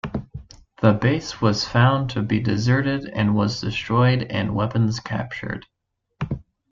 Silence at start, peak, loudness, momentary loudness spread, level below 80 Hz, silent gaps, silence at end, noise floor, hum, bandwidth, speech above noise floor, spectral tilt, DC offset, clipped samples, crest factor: 0.05 s; -4 dBFS; -22 LUFS; 14 LU; -46 dBFS; none; 0.3 s; -77 dBFS; none; 7.4 kHz; 56 dB; -6.5 dB/octave; under 0.1%; under 0.1%; 18 dB